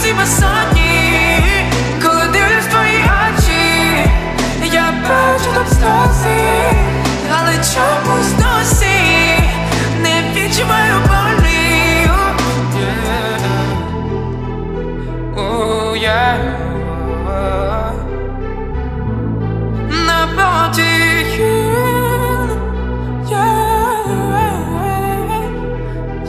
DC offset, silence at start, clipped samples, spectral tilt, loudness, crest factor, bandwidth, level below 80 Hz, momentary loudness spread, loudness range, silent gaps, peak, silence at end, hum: 0.2%; 0 s; under 0.1%; -4.5 dB/octave; -13 LUFS; 14 dB; 15.5 kHz; -22 dBFS; 10 LU; 6 LU; none; 0 dBFS; 0 s; none